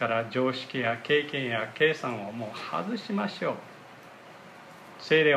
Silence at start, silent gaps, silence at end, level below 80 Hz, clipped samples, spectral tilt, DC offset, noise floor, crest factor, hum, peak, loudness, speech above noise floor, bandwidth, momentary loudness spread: 0 s; none; 0 s; -78 dBFS; under 0.1%; -5.5 dB/octave; under 0.1%; -49 dBFS; 20 dB; none; -8 dBFS; -29 LUFS; 21 dB; 12 kHz; 22 LU